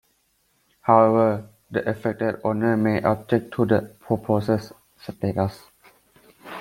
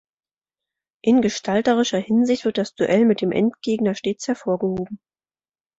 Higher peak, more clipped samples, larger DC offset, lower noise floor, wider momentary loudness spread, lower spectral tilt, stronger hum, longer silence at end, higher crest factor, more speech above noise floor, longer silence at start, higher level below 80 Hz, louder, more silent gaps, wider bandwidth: first, -2 dBFS vs -6 dBFS; neither; neither; second, -67 dBFS vs under -90 dBFS; first, 12 LU vs 8 LU; first, -8.5 dB/octave vs -5.5 dB/octave; neither; second, 0 s vs 0.85 s; first, 22 dB vs 16 dB; second, 45 dB vs over 70 dB; second, 0.85 s vs 1.05 s; about the same, -58 dBFS vs -60 dBFS; about the same, -23 LUFS vs -21 LUFS; neither; first, 16.5 kHz vs 8 kHz